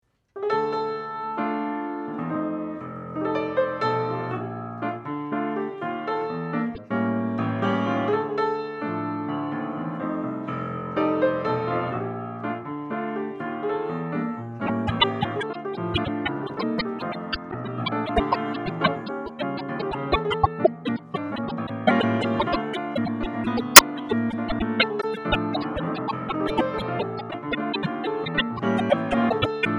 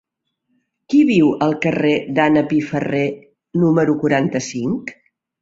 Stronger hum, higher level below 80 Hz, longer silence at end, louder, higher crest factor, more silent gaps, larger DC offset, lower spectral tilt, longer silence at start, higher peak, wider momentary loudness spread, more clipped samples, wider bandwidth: neither; first, -48 dBFS vs -58 dBFS; second, 0 s vs 0.5 s; second, -25 LUFS vs -17 LUFS; first, 26 dB vs 16 dB; neither; neither; second, -3.5 dB/octave vs -6.5 dB/octave; second, 0.35 s vs 0.9 s; about the same, 0 dBFS vs -2 dBFS; about the same, 8 LU vs 10 LU; neither; first, 14 kHz vs 7.8 kHz